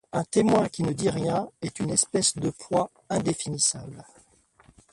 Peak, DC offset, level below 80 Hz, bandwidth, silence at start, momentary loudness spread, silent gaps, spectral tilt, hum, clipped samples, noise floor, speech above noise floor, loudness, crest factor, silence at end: -6 dBFS; under 0.1%; -58 dBFS; 11.5 kHz; 0.15 s; 10 LU; none; -4 dB/octave; none; under 0.1%; -60 dBFS; 34 dB; -26 LUFS; 20 dB; 0.9 s